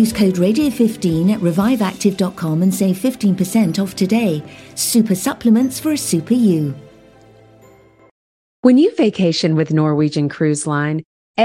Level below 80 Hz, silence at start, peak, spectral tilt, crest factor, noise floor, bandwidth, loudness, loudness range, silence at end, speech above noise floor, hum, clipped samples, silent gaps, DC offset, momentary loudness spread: -52 dBFS; 0 s; 0 dBFS; -5.5 dB/octave; 16 dB; -47 dBFS; 16.5 kHz; -16 LUFS; 2 LU; 0 s; 31 dB; none; under 0.1%; 8.11-8.63 s, 11.05-11.34 s; under 0.1%; 6 LU